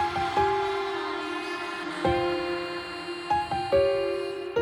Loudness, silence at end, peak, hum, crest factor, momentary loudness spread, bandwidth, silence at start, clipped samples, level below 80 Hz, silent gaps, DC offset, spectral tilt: -28 LUFS; 0 s; -12 dBFS; none; 16 dB; 8 LU; 16 kHz; 0 s; under 0.1%; -52 dBFS; none; under 0.1%; -5 dB/octave